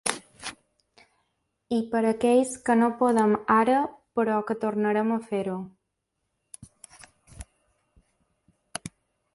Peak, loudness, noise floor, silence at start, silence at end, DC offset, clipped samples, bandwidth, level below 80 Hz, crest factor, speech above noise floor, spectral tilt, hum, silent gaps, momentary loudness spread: -4 dBFS; -25 LUFS; -80 dBFS; 0.05 s; 0.45 s; under 0.1%; under 0.1%; 11.5 kHz; -62 dBFS; 22 dB; 56 dB; -5 dB/octave; none; none; 23 LU